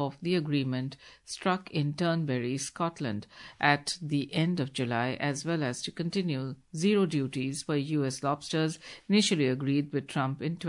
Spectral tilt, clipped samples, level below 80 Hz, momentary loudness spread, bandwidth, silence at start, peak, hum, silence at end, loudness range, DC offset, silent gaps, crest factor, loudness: -5 dB/octave; under 0.1%; -70 dBFS; 9 LU; 11 kHz; 0 s; -8 dBFS; none; 0 s; 2 LU; under 0.1%; none; 22 dB; -30 LUFS